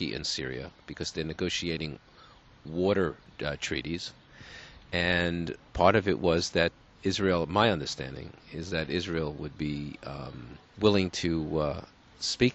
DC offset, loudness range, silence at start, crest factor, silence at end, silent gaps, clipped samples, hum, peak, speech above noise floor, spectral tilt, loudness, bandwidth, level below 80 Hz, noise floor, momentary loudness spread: under 0.1%; 6 LU; 0 s; 24 dB; 0 s; none; under 0.1%; none; -6 dBFS; 26 dB; -5 dB/octave; -30 LUFS; 8.2 kHz; -50 dBFS; -55 dBFS; 16 LU